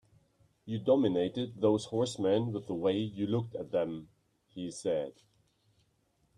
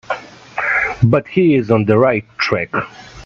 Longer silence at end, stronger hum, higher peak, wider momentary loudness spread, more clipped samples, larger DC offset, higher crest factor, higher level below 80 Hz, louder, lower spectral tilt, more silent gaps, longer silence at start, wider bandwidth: first, 1.25 s vs 0 s; neither; second, -14 dBFS vs 0 dBFS; about the same, 13 LU vs 13 LU; neither; neither; about the same, 18 dB vs 16 dB; second, -70 dBFS vs -46 dBFS; second, -32 LUFS vs -15 LUFS; about the same, -6.5 dB/octave vs -7.5 dB/octave; neither; first, 0.65 s vs 0.1 s; first, 11 kHz vs 7.2 kHz